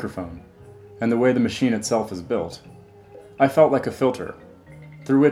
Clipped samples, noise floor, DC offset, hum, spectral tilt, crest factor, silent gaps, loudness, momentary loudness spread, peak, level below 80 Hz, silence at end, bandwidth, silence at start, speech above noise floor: under 0.1%; -45 dBFS; under 0.1%; none; -6 dB/octave; 20 dB; none; -21 LUFS; 18 LU; -2 dBFS; -54 dBFS; 0 s; 14.5 kHz; 0 s; 24 dB